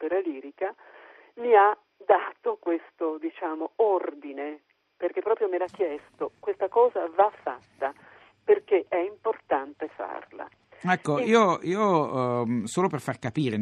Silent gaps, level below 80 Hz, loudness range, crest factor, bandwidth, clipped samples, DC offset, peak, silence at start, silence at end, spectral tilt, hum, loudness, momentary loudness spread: none; -74 dBFS; 4 LU; 20 dB; 12 kHz; under 0.1%; under 0.1%; -6 dBFS; 0 s; 0 s; -6 dB/octave; none; -27 LUFS; 14 LU